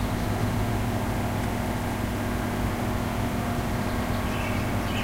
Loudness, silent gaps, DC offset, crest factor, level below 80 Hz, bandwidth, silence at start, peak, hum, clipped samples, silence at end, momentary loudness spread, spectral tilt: -28 LUFS; none; under 0.1%; 14 dB; -36 dBFS; 16 kHz; 0 s; -14 dBFS; none; under 0.1%; 0 s; 1 LU; -6 dB/octave